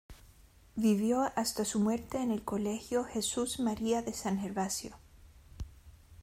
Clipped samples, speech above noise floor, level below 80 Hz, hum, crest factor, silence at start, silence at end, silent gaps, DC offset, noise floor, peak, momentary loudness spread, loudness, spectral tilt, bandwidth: under 0.1%; 27 dB; -56 dBFS; none; 16 dB; 0.1 s; 0 s; none; under 0.1%; -59 dBFS; -18 dBFS; 16 LU; -33 LUFS; -4.5 dB/octave; 16 kHz